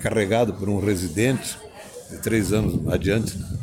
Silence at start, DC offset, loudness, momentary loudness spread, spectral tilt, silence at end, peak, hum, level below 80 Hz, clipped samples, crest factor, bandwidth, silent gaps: 0 s; under 0.1%; -23 LUFS; 14 LU; -5.5 dB/octave; 0 s; -8 dBFS; none; -40 dBFS; under 0.1%; 16 dB; 17 kHz; none